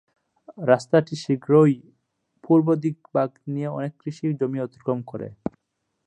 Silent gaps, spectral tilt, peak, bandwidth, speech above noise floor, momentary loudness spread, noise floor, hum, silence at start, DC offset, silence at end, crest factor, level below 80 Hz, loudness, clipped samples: none; -8 dB/octave; -2 dBFS; 9.2 kHz; 55 dB; 14 LU; -77 dBFS; none; 0.5 s; under 0.1%; 0.6 s; 20 dB; -64 dBFS; -23 LUFS; under 0.1%